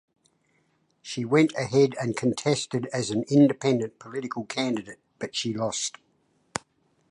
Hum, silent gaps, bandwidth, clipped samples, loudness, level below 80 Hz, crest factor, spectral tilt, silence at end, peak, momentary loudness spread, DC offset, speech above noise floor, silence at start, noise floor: none; none; 11 kHz; under 0.1%; -26 LUFS; -68 dBFS; 20 dB; -5 dB/octave; 0.55 s; -6 dBFS; 15 LU; under 0.1%; 44 dB; 1.05 s; -69 dBFS